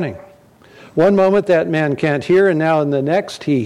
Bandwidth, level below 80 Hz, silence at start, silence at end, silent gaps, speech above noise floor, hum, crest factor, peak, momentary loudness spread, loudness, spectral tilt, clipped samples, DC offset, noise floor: 11.5 kHz; -54 dBFS; 0 s; 0 s; none; 31 dB; none; 12 dB; -4 dBFS; 6 LU; -15 LUFS; -7.5 dB/octave; under 0.1%; under 0.1%; -46 dBFS